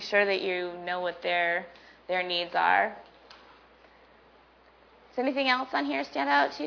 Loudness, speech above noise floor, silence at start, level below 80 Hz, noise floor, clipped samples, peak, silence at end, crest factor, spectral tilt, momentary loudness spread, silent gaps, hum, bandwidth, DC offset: -28 LUFS; 31 dB; 0 s; -70 dBFS; -58 dBFS; under 0.1%; -10 dBFS; 0 s; 20 dB; -4 dB/octave; 8 LU; none; none; 5.4 kHz; under 0.1%